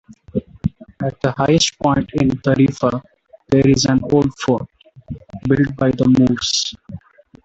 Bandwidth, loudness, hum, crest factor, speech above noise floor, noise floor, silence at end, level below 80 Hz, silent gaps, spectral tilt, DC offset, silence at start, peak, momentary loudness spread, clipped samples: 8.2 kHz; -17 LUFS; none; 16 dB; 22 dB; -38 dBFS; 0.45 s; -42 dBFS; none; -5.5 dB/octave; under 0.1%; 0.35 s; -2 dBFS; 17 LU; under 0.1%